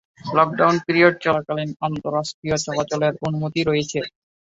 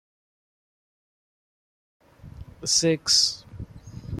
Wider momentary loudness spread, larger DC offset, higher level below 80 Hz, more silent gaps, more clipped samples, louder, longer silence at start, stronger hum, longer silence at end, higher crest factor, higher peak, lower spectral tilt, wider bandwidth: second, 10 LU vs 23 LU; neither; about the same, -56 dBFS vs -52 dBFS; first, 2.34-2.42 s vs none; neither; about the same, -21 LUFS vs -21 LUFS; second, 0.25 s vs 2.25 s; neither; first, 0.5 s vs 0 s; about the same, 20 dB vs 22 dB; first, -2 dBFS vs -6 dBFS; first, -5 dB/octave vs -2.5 dB/octave; second, 8 kHz vs 14.5 kHz